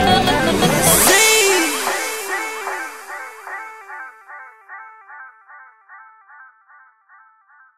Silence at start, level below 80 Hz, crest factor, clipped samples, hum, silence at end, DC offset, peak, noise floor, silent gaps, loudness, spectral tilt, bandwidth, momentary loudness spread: 0 s; -42 dBFS; 20 dB; under 0.1%; none; 1.35 s; under 0.1%; 0 dBFS; -52 dBFS; none; -14 LUFS; -2 dB/octave; 16 kHz; 27 LU